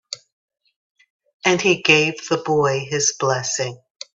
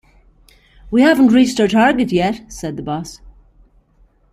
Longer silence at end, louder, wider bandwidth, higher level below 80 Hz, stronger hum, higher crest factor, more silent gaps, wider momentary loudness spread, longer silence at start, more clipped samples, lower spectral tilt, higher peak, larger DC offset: second, 0.4 s vs 1.05 s; second, -18 LUFS vs -15 LUFS; second, 8.4 kHz vs 14.5 kHz; second, -62 dBFS vs -44 dBFS; neither; about the same, 20 dB vs 16 dB; first, 0.32-0.48 s, 0.76-0.95 s, 1.10-1.20 s, 1.34-1.40 s vs none; about the same, 15 LU vs 15 LU; second, 0.1 s vs 0.85 s; neither; second, -3 dB/octave vs -5.5 dB/octave; about the same, 0 dBFS vs -2 dBFS; neither